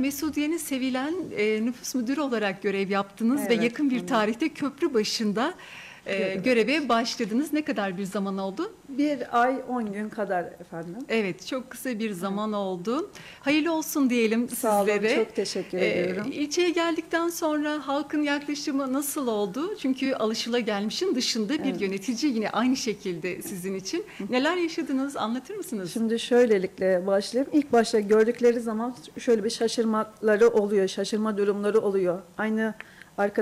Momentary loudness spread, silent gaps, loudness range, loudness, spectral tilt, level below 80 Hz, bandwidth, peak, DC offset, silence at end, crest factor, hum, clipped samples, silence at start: 9 LU; none; 5 LU; -26 LUFS; -4.5 dB/octave; -66 dBFS; 16 kHz; -10 dBFS; under 0.1%; 0 s; 14 dB; none; under 0.1%; 0 s